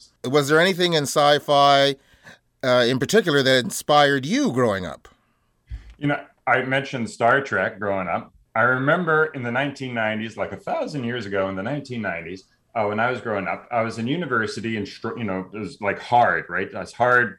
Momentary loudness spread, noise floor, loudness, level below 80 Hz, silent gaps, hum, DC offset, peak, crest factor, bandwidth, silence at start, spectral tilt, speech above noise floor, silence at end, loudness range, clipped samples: 12 LU; -66 dBFS; -21 LUFS; -54 dBFS; none; none; under 0.1%; -6 dBFS; 16 dB; 17.5 kHz; 0.25 s; -4.5 dB/octave; 45 dB; 0.05 s; 7 LU; under 0.1%